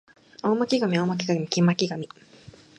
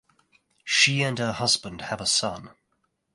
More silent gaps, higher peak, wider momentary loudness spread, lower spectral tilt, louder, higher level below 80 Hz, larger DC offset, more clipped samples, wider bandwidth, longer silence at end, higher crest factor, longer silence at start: neither; about the same, -6 dBFS vs -6 dBFS; second, 9 LU vs 14 LU; first, -5.5 dB/octave vs -2 dB/octave; about the same, -24 LUFS vs -23 LUFS; second, -68 dBFS vs -58 dBFS; neither; neither; second, 8.8 kHz vs 11.5 kHz; about the same, 0.75 s vs 0.65 s; about the same, 20 dB vs 20 dB; second, 0.45 s vs 0.65 s